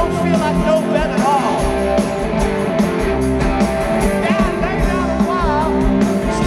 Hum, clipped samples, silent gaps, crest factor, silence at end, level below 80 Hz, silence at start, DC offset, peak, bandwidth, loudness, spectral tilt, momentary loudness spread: none; under 0.1%; none; 12 dB; 0 s; -26 dBFS; 0 s; under 0.1%; -2 dBFS; 13 kHz; -16 LUFS; -6.5 dB/octave; 2 LU